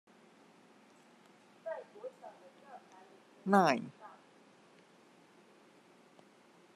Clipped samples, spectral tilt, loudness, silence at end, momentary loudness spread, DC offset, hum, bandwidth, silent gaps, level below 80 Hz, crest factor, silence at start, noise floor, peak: under 0.1%; -6 dB/octave; -34 LUFS; 2.65 s; 29 LU; under 0.1%; none; 13 kHz; none; -90 dBFS; 28 dB; 1.65 s; -63 dBFS; -12 dBFS